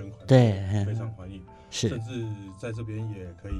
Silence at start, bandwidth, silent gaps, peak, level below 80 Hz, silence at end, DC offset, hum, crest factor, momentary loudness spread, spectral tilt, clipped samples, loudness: 0 s; 10.5 kHz; none; -4 dBFS; -48 dBFS; 0 s; under 0.1%; none; 22 dB; 19 LU; -6.5 dB/octave; under 0.1%; -27 LUFS